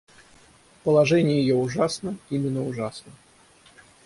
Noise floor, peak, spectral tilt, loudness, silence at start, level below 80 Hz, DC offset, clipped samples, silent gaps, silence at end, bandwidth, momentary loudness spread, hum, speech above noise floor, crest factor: -55 dBFS; -8 dBFS; -6.5 dB/octave; -23 LUFS; 0.85 s; -60 dBFS; under 0.1%; under 0.1%; none; 0.95 s; 11.5 kHz; 13 LU; none; 32 dB; 16 dB